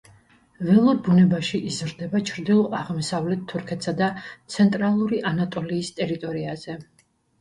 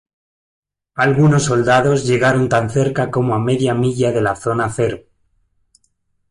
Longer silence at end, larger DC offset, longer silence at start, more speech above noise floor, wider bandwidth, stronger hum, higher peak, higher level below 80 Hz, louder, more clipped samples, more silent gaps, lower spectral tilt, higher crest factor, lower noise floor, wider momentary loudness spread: second, 0.6 s vs 1.3 s; neither; second, 0.6 s vs 0.95 s; second, 33 dB vs 50 dB; about the same, 11.5 kHz vs 11.5 kHz; neither; about the same, -6 dBFS vs -4 dBFS; second, -60 dBFS vs -48 dBFS; second, -23 LUFS vs -16 LUFS; neither; neither; about the same, -6.5 dB/octave vs -6 dB/octave; about the same, 16 dB vs 14 dB; second, -56 dBFS vs -65 dBFS; first, 13 LU vs 6 LU